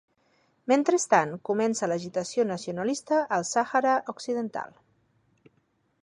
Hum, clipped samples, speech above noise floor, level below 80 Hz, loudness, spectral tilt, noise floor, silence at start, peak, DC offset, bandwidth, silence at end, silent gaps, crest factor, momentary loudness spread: none; under 0.1%; 44 dB; -76 dBFS; -27 LUFS; -4 dB/octave; -70 dBFS; 0.65 s; -6 dBFS; under 0.1%; 11.5 kHz; 1.4 s; none; 22 dB; 9 LU